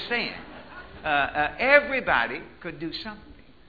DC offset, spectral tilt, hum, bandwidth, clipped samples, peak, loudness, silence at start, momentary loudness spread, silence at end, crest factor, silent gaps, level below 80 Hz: 0.2%; -6 dB/octave; none; 4.9 kHz; under 0.1%; -2 dBFS; -24 LUFS; 0 s; 22 LU; 0.35 s; 24 dB; none; -52 dBFS